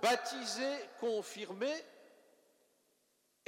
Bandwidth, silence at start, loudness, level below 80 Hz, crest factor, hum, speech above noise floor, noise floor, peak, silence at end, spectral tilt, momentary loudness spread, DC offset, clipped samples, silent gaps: 16 kHz; 0 s; -38 LUFS; under -90 dBFS; 22 dB; none; 40 dB; -77 dBFS; -18 dBFS; 1.45 s; -2 dB/octave; 9 LU; under 0.1%; under 0.1%; none